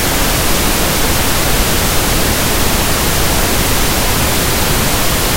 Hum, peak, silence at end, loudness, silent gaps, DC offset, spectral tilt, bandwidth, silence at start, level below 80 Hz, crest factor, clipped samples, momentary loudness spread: none; 0 dBFS; 0 s; -12 LUFS; none; under 0.1%; -3 dB/octave; 16.5 kHz; 0 s; -20 dBFS; 12 dB; under 0.1%; 0 LU